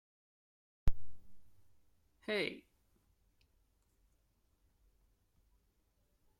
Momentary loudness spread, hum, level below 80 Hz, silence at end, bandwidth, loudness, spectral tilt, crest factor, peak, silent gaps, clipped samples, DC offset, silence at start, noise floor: 17 LU; none; -50 dBFS; 3.8 s; 11 kHz; -41 LUFS; -5.5 dB/octave; 24 dB; -16 dBFS; none; under 0.1%; under 0.1%; 0.85 s; -77 dBFS